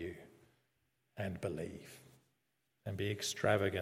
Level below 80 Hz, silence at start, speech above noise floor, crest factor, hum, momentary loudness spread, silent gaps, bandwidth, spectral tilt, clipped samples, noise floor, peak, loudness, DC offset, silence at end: -72 dBFS; 0 s; 45 dB; 24 dB; none; 23 LU; none; 15.5 kHz; -4.5 dB/octave; under 0.1%; -83 dBFS; -16 dBFS; -39 LUFS; under 0.1%; 0 s